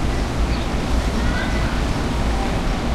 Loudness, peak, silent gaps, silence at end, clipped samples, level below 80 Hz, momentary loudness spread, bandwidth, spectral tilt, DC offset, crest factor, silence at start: -22 LUFS; -8 dBFS; none; 0 s; under 0.1%; -22 dBFS; 1 LU; 13 kHz; -5.5 dB/octave; under 0.1%; 12 dB; 0 s